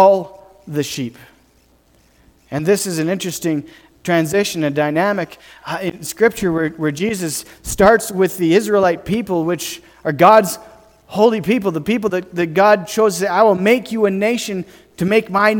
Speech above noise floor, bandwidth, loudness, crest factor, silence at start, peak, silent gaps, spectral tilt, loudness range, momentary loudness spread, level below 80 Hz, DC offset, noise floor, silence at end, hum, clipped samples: 38 dB; 19 kHz; -17 LUFS; 16 dB; 0 s; 0 dBFS; none; -5 dB/octave; 6 LU; 13 LU; -48 dBFS; under 0.1%; -54 dBFS; 0 s; none; under 0.1%